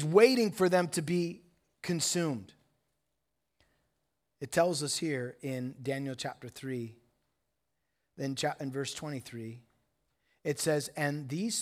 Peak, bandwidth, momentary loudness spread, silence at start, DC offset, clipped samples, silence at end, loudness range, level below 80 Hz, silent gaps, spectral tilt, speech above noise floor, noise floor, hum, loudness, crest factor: -10 dBFS; 16 kHz; 14 LU; 0 s; under 0.1%; under 0.1%; 0 s; 7 LU; -76 dBFS; none; -4.5 dB/octave; 53 dB; -84 dBFS; none; -32 LUFS; 24 dB